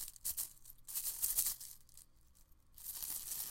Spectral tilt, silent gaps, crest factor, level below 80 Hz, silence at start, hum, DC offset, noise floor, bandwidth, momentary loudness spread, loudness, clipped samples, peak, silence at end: 1.5 dB/octave; none; 26 dB; -64 dBFS; 0 s; none; under 0.1%; -65 dBFS; 16.5 kHz; 17 LU; -39 LUFS; under 0.1%; -18 dBFS; 0 s